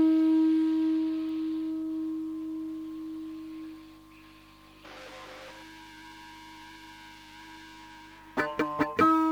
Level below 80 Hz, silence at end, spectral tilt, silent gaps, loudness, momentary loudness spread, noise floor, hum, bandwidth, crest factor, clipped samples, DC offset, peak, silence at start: -64 dBFS; 0 s; -6 dB/octave; none; -29 LUFS; 24 LU; -54 dBFS; 50 Hz at -60 dBFS; 9.2 kHz; 20 dB; under 0.1%; under 0.1%; -10 dBFS; 0 s